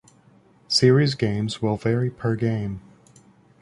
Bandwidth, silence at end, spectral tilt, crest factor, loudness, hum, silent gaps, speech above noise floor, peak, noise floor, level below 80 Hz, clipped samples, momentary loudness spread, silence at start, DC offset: 11.5 kHz; 0.85 s; -6 dB/octave; 18 dB; -22 LUFS; none; none; 34 dB; -4 dBFS; -55 dBFS; -52 dBFS; under 0.1%; 11 LU; 0.7 s; under 0.1%